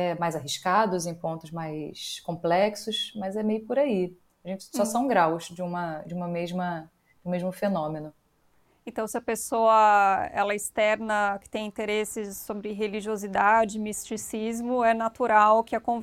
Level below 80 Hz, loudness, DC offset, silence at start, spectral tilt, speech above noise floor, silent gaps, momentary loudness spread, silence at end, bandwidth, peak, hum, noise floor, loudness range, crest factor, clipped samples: -62 dBFS; -26 LUFS; under 0.1%; 0 s; -4.5 dB/octave; 39 dB; none; 13 LU; 0 s; 16.5 kHz; -8 dBFS; none; -65 dBFS; 7 LU; 20 dB; under 0.1%